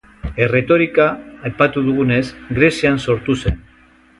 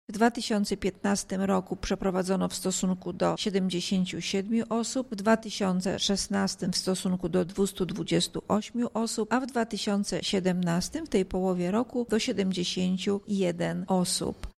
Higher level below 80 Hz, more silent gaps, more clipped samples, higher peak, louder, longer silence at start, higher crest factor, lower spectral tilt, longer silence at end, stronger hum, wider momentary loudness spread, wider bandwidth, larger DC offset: first, -34 dBFS vs -52 dBFS; neither; neither; first, 0 dBFS vs -8 dBFS; first, -16 LUFS vs -28 LUFS; first, 0.25 s vs 0.1 s; about the same, 16 dB vs 20 dB; first, -6.5 dB/octave vs -4.5 dB/octave; first, 0.6 s vs 0.1 s; neither; first, 11 LU vs 3 LU; second, 11.5 kHz vs 14.5 kHz; neither